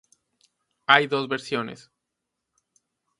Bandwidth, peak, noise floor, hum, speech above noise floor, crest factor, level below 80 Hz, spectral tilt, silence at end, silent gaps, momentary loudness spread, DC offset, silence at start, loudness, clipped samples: 11.5 kHz; 0 dBFS; -82 dBFS; none; 59 dB; 28 dB; -74 dBFS; -4 dB/octave; 1.45 s; none; 16 LU; under 0.1%; 0.9 s; -22 LUFS; under 0.1%